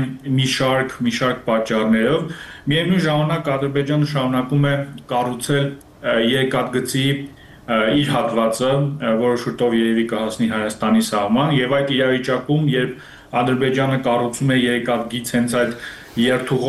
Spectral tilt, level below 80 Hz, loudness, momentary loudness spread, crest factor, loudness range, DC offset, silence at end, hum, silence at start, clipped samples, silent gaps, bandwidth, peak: -5.5 dB/octave; -52 dBFS; -19 LUFS; 5 LU; 14 dB; 1 LU; under 0.1%; 0 s; none; 0 s; under 0.1%; none; 13 kHz; -6 dBFS